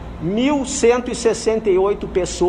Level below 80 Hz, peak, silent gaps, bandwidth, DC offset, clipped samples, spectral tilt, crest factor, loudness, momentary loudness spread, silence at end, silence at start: -36 dBFS; -4 dBFS; none; 11.5 kHz; under 0.1%; under 0.1%; -4.5 dB/octave; 14 dB; -18 LUFS; 5 LU; 0 s; 0 s